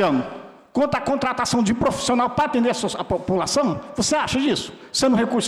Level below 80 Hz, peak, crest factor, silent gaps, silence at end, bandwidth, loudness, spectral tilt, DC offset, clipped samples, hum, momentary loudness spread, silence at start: -48 dBFS; -12 dBFS; 10 dB; none; 0 s; 13.5 kHz; -21 LUFS; -4 dB/octave; under 0.1%; under 0.1%; none; 6 LU; 0 s